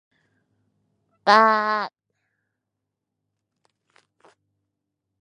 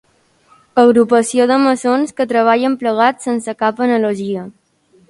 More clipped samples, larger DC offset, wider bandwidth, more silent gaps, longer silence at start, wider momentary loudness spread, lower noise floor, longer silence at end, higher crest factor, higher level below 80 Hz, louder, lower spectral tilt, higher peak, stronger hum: neither; neither; about the same, 10.5 kHz vs 11.5 kHz; neither; first, 1.25 s vs 0.75 s; first, 12 LU vs 9 LU; first, -82 dBFS vs -53 dBFS; first, 3.35 s vs 0.6 s; first, 26 dB vs 14 dB; second, -82 dBFS vs -62 dBFS; second, -19 LUFS vs -14 LUFS; about the same, -3.5 dB/octave vs -4.5 dB/octave; about the same, 0 dBFS vs 0 dBFS; neither